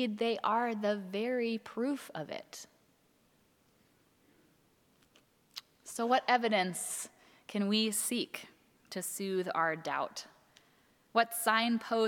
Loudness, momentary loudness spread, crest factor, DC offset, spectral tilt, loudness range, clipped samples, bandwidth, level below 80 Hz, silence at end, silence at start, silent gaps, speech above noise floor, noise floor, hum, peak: -33 LUFS; 18 LU; 22 dB; under 0.1%; -3 dB/octave; 11 LU; under 0.1%; 19 kHz; -84 dBFS; 0 s; 0 s; none; 37 dB; -70 dBFS; none; -14 dBFS